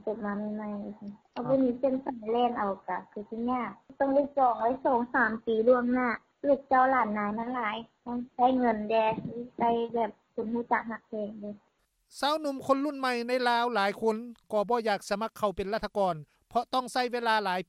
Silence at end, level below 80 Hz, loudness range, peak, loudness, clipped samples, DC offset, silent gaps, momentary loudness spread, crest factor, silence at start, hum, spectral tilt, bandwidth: 0.05 s; -62 dBFS; 5 LU; -12 dBFS; -29 LUFS; under 0.1%; under 0.1%; none; 13 LU; 18 dB; 0.05 s; none; -5.5 dB/octave; 14 kHz